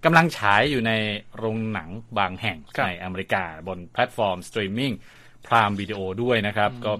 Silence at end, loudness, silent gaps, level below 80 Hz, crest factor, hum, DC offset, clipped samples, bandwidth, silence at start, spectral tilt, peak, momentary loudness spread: 0 s; -24 LUFS; none; -54 dBFS; 22 dB; none; under 0.1%; under 0.1%; 14.5 kHz; 0 s; -5.5 dB/octave; -2 dBFS; 11 LU